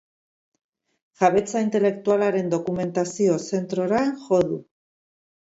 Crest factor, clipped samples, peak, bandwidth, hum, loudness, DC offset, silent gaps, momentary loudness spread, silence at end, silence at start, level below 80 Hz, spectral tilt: 20 dB; under 0.1%; -4 dBFS; 8 kHz; none; -23 LUFS; under 0.1%; none; 5 LU; 0.95 s; 1.2 s; -62 dBFS; -6 dB/octave